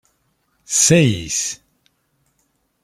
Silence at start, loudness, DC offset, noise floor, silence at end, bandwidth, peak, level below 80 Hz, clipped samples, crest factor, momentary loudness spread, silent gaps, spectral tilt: 0.7 s; -16 LUFS; under 0.1%; -67 dBFS; 1.3 s; 15.5 kHz; -2 dBFS; -52 dBFS; under 0.1%; 20 dB; 13 LU; none; -3.5 dB/octave